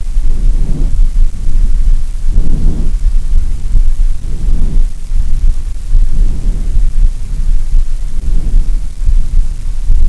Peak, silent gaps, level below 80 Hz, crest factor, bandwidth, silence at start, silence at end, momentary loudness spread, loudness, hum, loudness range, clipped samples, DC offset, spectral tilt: 0 dBFS; none; -8 dBFS; 8 dB; 1.3 kHz; 0 s; 0 s; 4 LU; -18 LUFS; none; 1 LU; 1%; 3%; -7 dB/octave